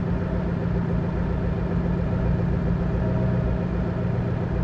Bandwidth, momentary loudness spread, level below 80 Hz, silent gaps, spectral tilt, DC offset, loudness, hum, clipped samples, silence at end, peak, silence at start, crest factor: 5.8 kHz; 2 LU; -30 dBFS; none; -10 dB/octave; under 0.1%; -25 LUFS; none; under 0.1%; 0 s; -12 dBFS; 0 s; 12 dB